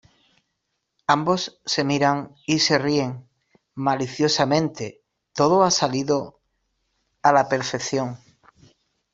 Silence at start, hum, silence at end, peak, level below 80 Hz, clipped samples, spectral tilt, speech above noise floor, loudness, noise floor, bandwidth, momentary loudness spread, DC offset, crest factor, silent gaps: 1.1 s; none; 0.95 s; -2 dBFS; -62 dBFS; under 0.1%; -4 dB/octave; 56 dB; -22 LUFS; -77 dBFS; 8 kHz; 15 LU; under 0.1%; 22 dB; none